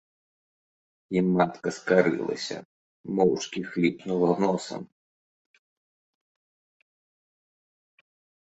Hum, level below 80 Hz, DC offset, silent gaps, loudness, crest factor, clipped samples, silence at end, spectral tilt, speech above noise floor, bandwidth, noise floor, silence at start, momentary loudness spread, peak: none; -68 dBFS; under 0.1%; 2.65-3.04 s; -26 LUFS; 24 dB; under 0.1%; 3.7 s; -6 dB/octave; over 65 dB; 8.2 kHz; under -90 dBFS; 1.1 s; 13 LU; -6 dBFS